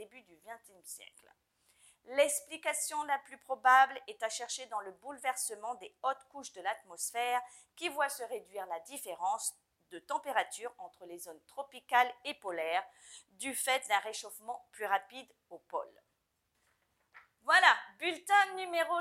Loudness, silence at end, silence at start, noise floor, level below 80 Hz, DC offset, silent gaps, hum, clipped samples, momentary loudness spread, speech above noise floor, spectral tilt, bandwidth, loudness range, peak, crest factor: -33 LUFS; 0 s; 0 s; -81 dBFS; -88 dBFS; under 0.1%; none; none; under 0.1%; 21 LU; 46 dB; 0.5 dB/octave; 16 kHz; 7 LU; -8 dBFS; 26 dB